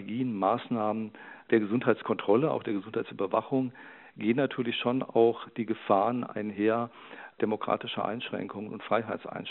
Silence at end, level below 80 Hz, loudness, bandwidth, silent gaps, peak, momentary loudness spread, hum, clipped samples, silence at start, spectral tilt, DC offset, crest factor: 0 s; -78 dBFS; -30 LUFS; 4.2 kHz; none; -8 dBFS; 11 LU; none; under 0.1%; 0 s; -4.5 dB/octave; under 0.1%; 20 dB